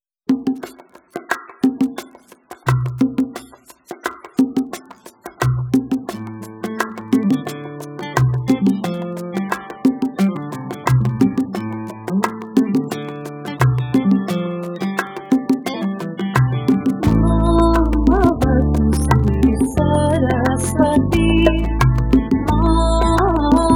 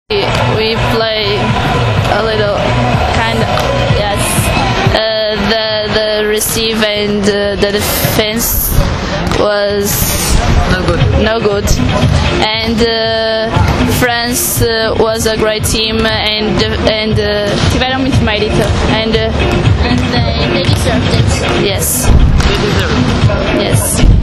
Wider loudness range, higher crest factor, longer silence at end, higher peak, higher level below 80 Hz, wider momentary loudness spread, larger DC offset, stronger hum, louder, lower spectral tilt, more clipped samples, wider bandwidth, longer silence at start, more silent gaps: first, 7 LU vs 1 LU; first, 18 dB vs 10 dB; about the same, 0 s vs 0 s; about the same, 0 dBFS vs 0 dBFS; second, -26 dBFS vs -18 dBFS; first, 13 LU vs 1 LU; neither; neither; second, -18 LUFS vs -11 LUFS; first, -7 dB/octave vs -4.5 dB/octave; second, under 0.1% vs 0.3%; first, 18 kHz vs 14.5 kHz; first, 0.3 s vs 0.1 s; neither